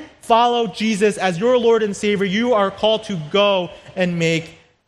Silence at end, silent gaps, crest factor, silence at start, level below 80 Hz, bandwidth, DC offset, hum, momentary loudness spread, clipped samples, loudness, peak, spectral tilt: 0.35 s; none; 16 dB; 0 s; -56 dBFS; 12.5 kHz; under 0.1%; none; 7 LU; under 0.1%; -18 LUFS; -2 dBFS; -5 dB/octave